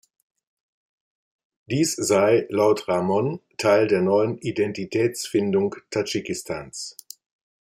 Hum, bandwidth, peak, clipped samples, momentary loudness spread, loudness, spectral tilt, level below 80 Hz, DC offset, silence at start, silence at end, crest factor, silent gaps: none; 16 kHz; -6 dBFS; under 0.1%; 12 LU; -22 LUFS; -5 dB/octave; -64 dBFS; under 0.1%; 1.7 s; 0.7 s; 18 dB; none